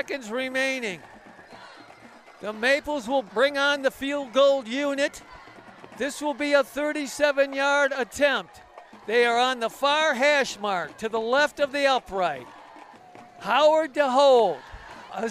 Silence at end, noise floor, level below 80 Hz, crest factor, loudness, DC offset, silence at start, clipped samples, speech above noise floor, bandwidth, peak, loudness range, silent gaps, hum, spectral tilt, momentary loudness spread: 0 s; -49 dBFS; -60 dBFS; 16 dB; -23 LUFS; under 0.1%; 0 s; under 0.1%; 26 dB; 15 kHz; -10 dBFS; 4 LU; none; none; -2.5 dB/octave; 13 LU